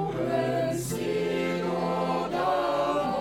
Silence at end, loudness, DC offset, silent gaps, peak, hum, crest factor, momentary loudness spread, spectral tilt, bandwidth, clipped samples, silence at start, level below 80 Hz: 0 s; -28 LUFS; under 0.1%; none; -14 dBFS; none; 14 dB; 3 LU; -5.5 dB/octave; 16.5 kHz; under 0.1%; 0 s; -54 dBFS